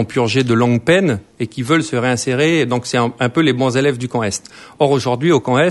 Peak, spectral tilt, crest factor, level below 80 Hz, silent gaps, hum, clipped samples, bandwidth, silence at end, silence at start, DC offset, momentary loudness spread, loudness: 0 dBFS; -5.5 dB/octave; 16 dB; -52 dBFS; none; none; under 0.1%; 11.5 kHz; 0 s; 0 s; under 0.1%; 6 LU; -16 LUFS